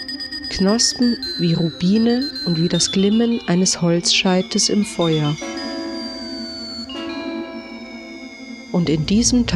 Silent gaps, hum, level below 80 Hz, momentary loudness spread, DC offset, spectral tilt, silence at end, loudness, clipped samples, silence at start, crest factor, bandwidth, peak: none; none; -42 dBFS; 16 LU; under 0.1%; -4 dB/octave; 0 s; -19 LUFS; under 0.1%; 0 s; 16 dB; 12.5 kHz; -2 dBFS